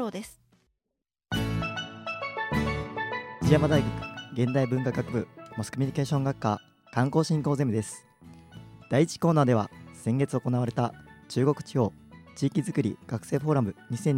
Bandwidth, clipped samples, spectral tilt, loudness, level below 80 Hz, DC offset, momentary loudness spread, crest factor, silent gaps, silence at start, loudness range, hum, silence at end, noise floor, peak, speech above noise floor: 15.5 kHz; under 0.1%; -6.5 dB/octave; -28 LUFS; -52 dBFS; under 0.1%; 12 LU; 22 dB; none; 0 s; 2 LU; none; 0 s; -86 dBFS; -6 dBFS; 59 dB